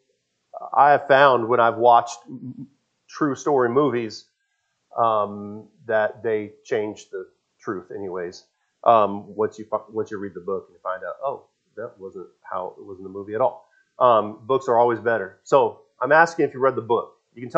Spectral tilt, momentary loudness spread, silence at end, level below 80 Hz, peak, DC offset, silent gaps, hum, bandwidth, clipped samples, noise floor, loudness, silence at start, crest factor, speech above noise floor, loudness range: -5.5 dB/octave; 21 LU; 0 s; -78 dBFS; 0 dBFS; under 0.1%; none; none; 8.2 kHz; under 0.1%; -73 dBFS; -21 LUFS; 0.55 s; 22 dB; 52 dB; 11 LU